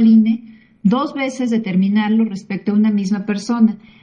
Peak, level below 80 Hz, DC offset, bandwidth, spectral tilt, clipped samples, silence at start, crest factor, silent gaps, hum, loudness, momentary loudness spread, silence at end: -2 dBFS; -62 dBFS; under 0.1%; 7.6 kHz; -7 dB/octave; under 0.1%; 0 s; 14 dB; none; none; -17 LUFS; 6 LU; 0.25 s